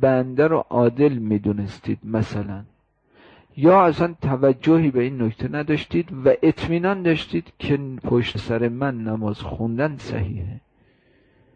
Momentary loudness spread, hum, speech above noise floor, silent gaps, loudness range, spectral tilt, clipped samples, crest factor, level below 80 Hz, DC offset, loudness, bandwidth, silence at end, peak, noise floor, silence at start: 11 LU; none; 39 dB; none; 5 LU; -8.5 dB/octave; under 0.1%; 16 dB; -48 dBFS; under 0.1%; -21 LUFS; 8 kHz; 0.95 s; -6 dBFS; -59 dBFS; 0 s